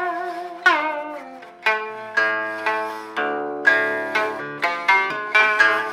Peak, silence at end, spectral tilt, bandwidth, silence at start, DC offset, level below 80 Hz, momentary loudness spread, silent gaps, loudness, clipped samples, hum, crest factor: -2 dBFS; 0 s; -2.5 dB/octave; 15.5 kHz; 0 s; under 0.1%; -70 dBFS; 11 LU; none; -20 LUFS; under 0.1%; none; 20 dB